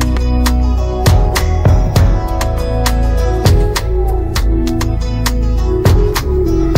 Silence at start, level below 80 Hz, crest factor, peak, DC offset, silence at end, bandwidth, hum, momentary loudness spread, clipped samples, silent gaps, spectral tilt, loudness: 0 s; -14 dBFS; 12 dB; 0 dBFS; under 0.1%; 0 s; 16.5 kHz; none; 5 LU; under 0.1%; none; -6 dB/octave; -14 LUFS